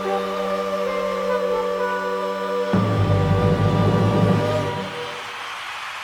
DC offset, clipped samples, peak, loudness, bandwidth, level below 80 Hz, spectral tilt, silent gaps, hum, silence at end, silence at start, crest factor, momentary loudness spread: under 0.1%; under 0.1%; -4 dBFS; -22 LUFS; 13.5 kHz; -42 dBFS; -7 dB/octave; none; none; 0 s; 0 s; 16 dB; 11 LU